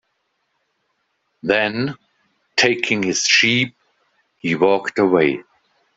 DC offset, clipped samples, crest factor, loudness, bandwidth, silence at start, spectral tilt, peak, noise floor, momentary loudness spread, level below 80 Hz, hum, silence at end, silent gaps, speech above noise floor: under 0.1%; under 0.1%; 20 dB; -17 LUFS; 8 kHz; 1.45 s; -3.5 dB/octave; 0 dBFS; -70 dBFS; 13 LU; -62 dBFS; none; 0.55 s; none; 53 dB